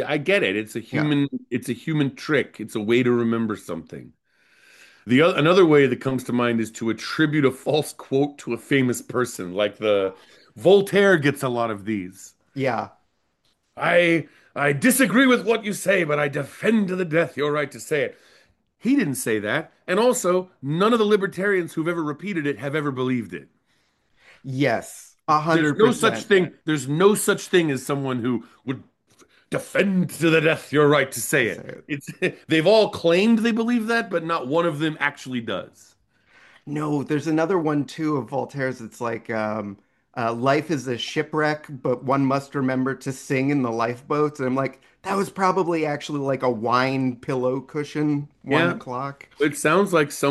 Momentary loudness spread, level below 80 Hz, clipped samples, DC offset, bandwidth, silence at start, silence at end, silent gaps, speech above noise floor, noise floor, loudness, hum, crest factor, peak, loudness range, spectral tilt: 12 LU; -66 dBFS; under 0.1%; under 0.1%; 12.5 kHz; 0 s; 0 s; none; 47 dB; -69 dBFS; -22 LUFS; none; 18 dB; -4 dBFS; 5 LU; -5 dB/octave